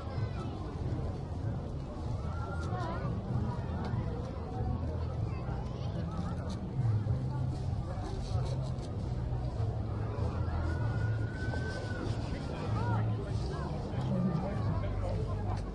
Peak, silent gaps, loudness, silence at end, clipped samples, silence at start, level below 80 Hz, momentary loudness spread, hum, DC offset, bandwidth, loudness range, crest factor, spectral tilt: -22 dBFS; none; -36 LUFS; 0 s; under 0.1%; 0 s; -42 dBFS; 5 LU; none; under 0.1%; 10.5 kHz; 2 LU; 12 dB; -8 dB/octave